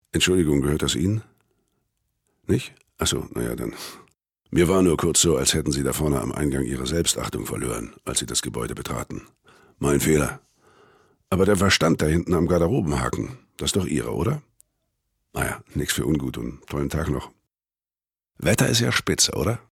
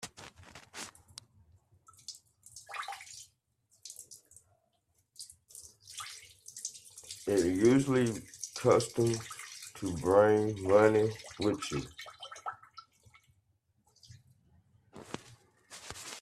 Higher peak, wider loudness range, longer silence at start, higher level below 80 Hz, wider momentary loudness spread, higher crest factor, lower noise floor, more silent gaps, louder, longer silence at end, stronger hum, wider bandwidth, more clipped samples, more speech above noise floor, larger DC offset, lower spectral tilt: about the same, -8 dBFS vs -10 dBFS; second, 7 LU vs 21 LU; first, 0.15 s vs 0 s; first, -42 dBFS vs -66 dBFS; second, 12 LU vs 26 LU; second, 16 dB vs 24 dB; first, under -90 dBFS vs -76 dBFS; neither; first, -23 LUFS vs -31 LUFS; about the same, 0.1 s vs 0 s; neither; first, 17.5 kHz vs 14.5 kHz; neither; first, over 67 dB vs 48 dB; neither; about the same, -4 dB/octave vs -5 dB/octave